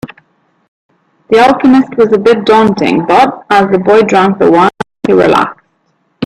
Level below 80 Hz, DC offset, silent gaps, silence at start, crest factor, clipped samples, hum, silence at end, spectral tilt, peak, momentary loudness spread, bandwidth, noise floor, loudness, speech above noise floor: -46 dBFS; under 0.1%; 0.68-0.89 s; 0.05 s; 10 dB; under 0.1%; none; 0 s; -6 dB/octave; 0 dBFS; 5 LU; 12 kHz; -58 dBFS; -8 LUFS; 51 dB